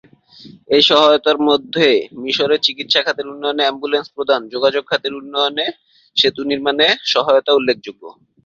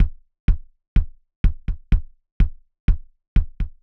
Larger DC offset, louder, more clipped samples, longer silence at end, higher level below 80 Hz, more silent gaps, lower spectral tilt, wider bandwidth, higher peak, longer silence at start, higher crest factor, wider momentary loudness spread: neither; first, -15 LUFS vs -27 LUFS; neither; first, 0.35 s vs 0.1 s; second, -62 dBFS vs -22 dBFS; second, none vs 0.40-0.48 s, 0.88-0.96 s, 1.36-1.44 s, 2.32-2.40 s, 2.80-2.88 s, 3.28-3.36 s; second, -3.5 dB/octave vs -9 dB/octave; first, 7.6 kHz vs 3.8 kHz; first, 0 dBFS vs -6 dBFS; first, 0.45 s vs 0 s; about the same, 16 dB vs 16 dB; first, 9 LU vs 4 LU